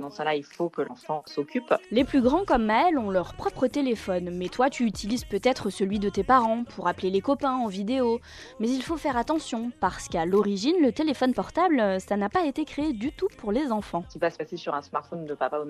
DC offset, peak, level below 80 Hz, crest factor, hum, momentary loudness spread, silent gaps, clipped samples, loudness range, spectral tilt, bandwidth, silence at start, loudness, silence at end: under 0.1%; -8 dBFS; -50 dBFS; 18 dB; none; 9 LU; none; under 0.1%; 3 LU; -5.5 dB/octave; 13 kHz; 0 s; -26 LUFS; 0 s